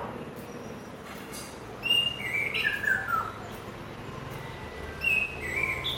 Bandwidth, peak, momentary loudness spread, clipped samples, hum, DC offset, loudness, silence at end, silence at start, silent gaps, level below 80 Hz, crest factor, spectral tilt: 16.5 kHz; -14 dBFS; 16 LU; under 0.1%; none; under 0.1%; -28 LUFS; 0 s; 0 s; none; -52 dBFS; 18 dB; -3 dB/octave